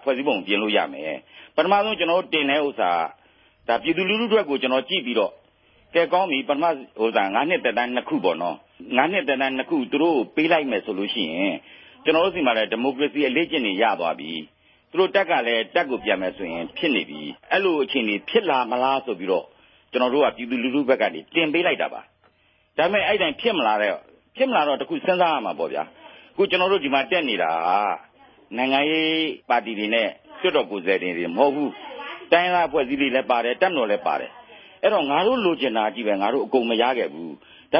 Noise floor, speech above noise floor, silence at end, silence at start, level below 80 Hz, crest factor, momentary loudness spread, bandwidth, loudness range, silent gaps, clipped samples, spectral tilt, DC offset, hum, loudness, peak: -62 dBFS; 40 dB; 0 s; 0 s; -64 dBFS; 20 dB; 9 LU; 5.8 kHz; 1 LU; none; under 0.1%; -9 dB/octave; under 0.1%; none; -22 LUFS; -2 dBFS